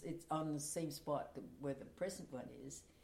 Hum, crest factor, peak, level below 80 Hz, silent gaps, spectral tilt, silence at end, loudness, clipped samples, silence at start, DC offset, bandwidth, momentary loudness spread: none; 18 dB; -28 dBFS; -72 dBFS; none; -5 dB/octave; 0 s; -45 LUFS; under 0.1%; 0 s; under 0.1%; 16.5 kHz; 10 LU